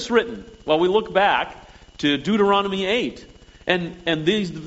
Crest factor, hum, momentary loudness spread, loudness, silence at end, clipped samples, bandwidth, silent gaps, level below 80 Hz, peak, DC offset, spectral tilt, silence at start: 20 dB; none; 12 LU; -21 LUFS; 0 s; under 0.1%; 8 kHz; none; -50 dBFS; -2 dBFS; under 0.1%; -3 dB/octave; 0 s